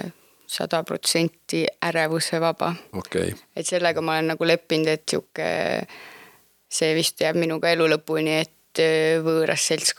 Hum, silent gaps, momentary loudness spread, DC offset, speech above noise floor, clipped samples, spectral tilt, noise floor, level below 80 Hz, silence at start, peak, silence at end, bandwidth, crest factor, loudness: none; none; 9 LU; under 0.1%; 30 dB; under 0.1%; -3.5 dB/octave; -53 dBFS; -66 dBFS; 0 s; -2 dBFS; 0.05 s; 19 kHz; 20 dB; -23 LUFS